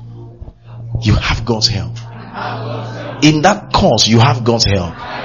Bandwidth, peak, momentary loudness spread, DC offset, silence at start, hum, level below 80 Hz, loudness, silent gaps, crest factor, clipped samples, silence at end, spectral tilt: 7.4 kHz; 0 dBFS; 19 LU; 0.3%; 0 s; none; -30 dBFS; -13 LUFS; none; 14 dB; under 0.1%; 0 s; -4.5 dB/octave